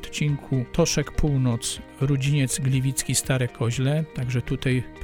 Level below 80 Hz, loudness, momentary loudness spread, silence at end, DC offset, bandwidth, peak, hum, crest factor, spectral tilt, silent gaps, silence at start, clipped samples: -38 dBFS; -24 LUFS; 5 LU; 0 s; under 0.1%; 17.5 kHz; -10 dBFS; none; 14 dB; -5 dB/octave; none; 0 s; under 0.1%